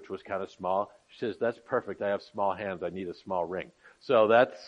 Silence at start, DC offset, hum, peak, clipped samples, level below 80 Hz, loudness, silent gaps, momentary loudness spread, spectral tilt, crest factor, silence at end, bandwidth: 0 s; under 0.1%; none; -10 dBFS; under 0.1%; -74 dBFS; -30 LUFS; none; 15 LU; -6.5 dB/octave; 20 dB; 0 s; 7.8 kHz